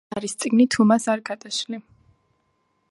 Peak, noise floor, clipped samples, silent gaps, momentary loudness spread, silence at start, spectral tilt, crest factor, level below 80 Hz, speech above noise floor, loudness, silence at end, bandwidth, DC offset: -6 dBFS; -69 dBFS; under 0.1%; none; 14 LU; 0.1 s; -4.5 dB/octave; 18 dB; -64 dBFS; 48 dB; -21 LUFS; 1.1 s; 11.5 kHz; under 0.1%